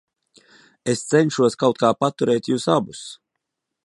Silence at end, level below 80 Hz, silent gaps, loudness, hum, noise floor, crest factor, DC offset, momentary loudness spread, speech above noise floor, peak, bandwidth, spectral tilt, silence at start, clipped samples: 0.75 s; -64 dBFS; none; -20 LUFS; none; -80 dBFS; 20 dB; under 0.1%; 13 LU; 60 dB; -2 dBFS; 11.5 kHz; -5.5 dB/octave; 0.85 s; under 0.1%